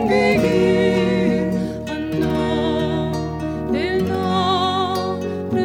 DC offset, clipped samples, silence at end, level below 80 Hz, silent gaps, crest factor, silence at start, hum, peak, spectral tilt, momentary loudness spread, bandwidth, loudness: under 0.1%; under 0.1%; 0 s; -40 dBFS; none; 14 dB; 0 s; none; -4 dBFS; -6.5 dB/octave; 8 LU; 16.5 kHz; -19 LUFS